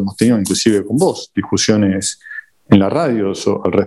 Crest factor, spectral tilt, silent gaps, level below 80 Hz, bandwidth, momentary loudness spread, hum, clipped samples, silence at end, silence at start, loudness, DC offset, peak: 14 dB; -5 dB/octave; none; -52 dBFS; 12.5 kHz; 9 LU; none; under 0.1%; 0 s; 0 s; -15 LUFS; under 0.1%; 0 dBFS